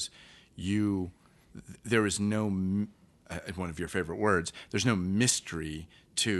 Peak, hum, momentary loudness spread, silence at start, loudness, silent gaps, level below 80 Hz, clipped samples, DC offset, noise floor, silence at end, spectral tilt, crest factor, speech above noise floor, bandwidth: -10 dBFS; none; 15 LU; 0 s; -31 LUFS; none; -56 dBFS; under 0.1%; under 0.1%; -56 dBFS; 0 s; -4 dB/octave; 20 dB; 26 dB; 12 kHz